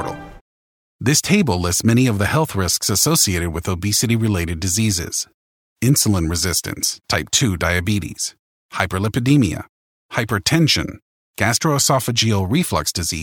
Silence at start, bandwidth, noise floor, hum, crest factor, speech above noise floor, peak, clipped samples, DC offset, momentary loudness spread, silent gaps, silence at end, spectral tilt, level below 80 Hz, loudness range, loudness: 0 s; 18.5 kHz; under -90 dBFS; none; 18 dB; over 72 dB; 0 dBFS; under 0.1%; under 0.1%; 9 LU; 0.41-0.99 s, 5.34-5.76 s, 8.39-8.69 s, 9.69-10.09 s, 11.02-11.34 s; 0 s; -4 dB/octave; -40 dBFS; 3 LU; -18 LUFS